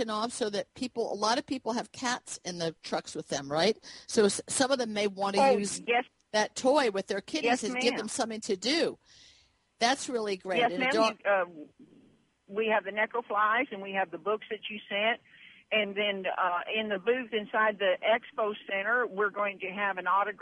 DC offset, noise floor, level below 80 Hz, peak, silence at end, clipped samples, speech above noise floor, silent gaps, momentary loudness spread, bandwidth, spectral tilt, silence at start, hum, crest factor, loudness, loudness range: under 0.1%; -65 dBFS; -74 dBFS; -10 dBFS; 0.05 s; under 0.1%; 35 dB; none; 8 LU; 11.5 kHz; -3 dB/octave; 0 s; none; 20 dB; -30 LUFS; 3 LU